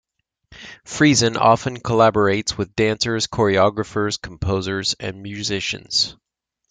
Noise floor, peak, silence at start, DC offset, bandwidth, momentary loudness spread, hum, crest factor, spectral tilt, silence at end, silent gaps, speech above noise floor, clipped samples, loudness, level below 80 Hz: -55 dBFS; -2 dBFS; 0.5 s; under 0.1%; 9.6 kHz; 11 LU; none; 18 dB; -4 dB/octave; 0.6 s; none; 36 dB; under 0.1%; -19 LUFS; -46 dBFS